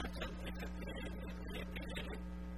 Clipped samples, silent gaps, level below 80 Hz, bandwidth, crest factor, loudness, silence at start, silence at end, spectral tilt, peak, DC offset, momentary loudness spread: under 0.1%; none; -48 dBFS; 15.5 kHz; 16 dB; -46 LUFS; 0 s; 0 s; -6 dB/octave; -28 dBFS; 0.1%; 2 LU